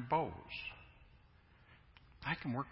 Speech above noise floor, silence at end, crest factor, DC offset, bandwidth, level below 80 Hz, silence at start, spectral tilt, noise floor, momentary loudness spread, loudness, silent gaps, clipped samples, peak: 26 dB; 0 s; 22 dB; under 0.1%; 5.6 kHz; -64 dBFS; 0 s; -4 dB/octave; -65 dBFS; 27 LU; -41 LUFS; none; under 0.1%; -22 dBFS